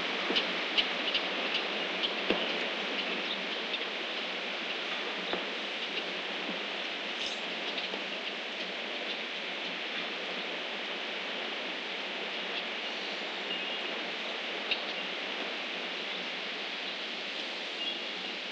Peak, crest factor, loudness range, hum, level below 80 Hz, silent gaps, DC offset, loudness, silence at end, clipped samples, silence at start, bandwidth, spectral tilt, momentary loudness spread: -12 dBFS; 24 dB; 4 LU; none; -76 dBFS; none; under 0.1%; -33 LUFS; 0 s; under 0.1%; 0 s; 9.8 kHz; -2.5 dB/octave; 5 LU